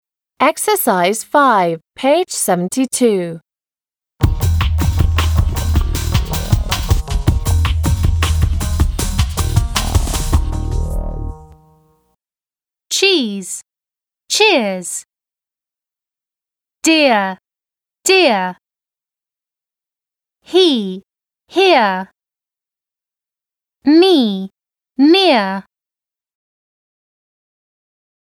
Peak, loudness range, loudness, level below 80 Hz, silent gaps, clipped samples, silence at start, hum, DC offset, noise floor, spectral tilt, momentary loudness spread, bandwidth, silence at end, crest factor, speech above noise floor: 0 dBFS; 5 LU; -15 LUFS; -24 dBFS; none; under 0.1%; 0.4 s; none; under 0.1%; under -90 dBFS; -4.5 dB/octave; 14 LU; over 20 kHz; 2.75 s; 16 dB; over 77 dB